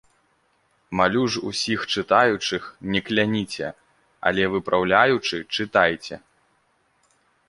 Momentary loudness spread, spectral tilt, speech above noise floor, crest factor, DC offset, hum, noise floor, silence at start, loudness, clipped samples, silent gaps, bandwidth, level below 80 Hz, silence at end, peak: 12 LU; -4.5 dB/octave; 44 dB; 22 dB; under 0.1%; none; -66 dBFS; 0.9 s; -22 LUFS; under 0.1%; none; 11.5 kHz; -56 dBFS; 1.3 s; -2 dBFS